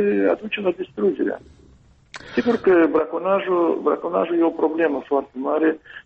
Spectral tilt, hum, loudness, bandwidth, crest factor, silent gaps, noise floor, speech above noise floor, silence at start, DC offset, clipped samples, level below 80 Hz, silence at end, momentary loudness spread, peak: -7 dB/octave; none; -21 LUFS; 7.2 kHz; 14 dB; none; -52 dBFS; 32 dB; 0 s; under 0.1%; under 0.1%; -58 dBFS; 0.05 s; 8 LU; -6 dBFS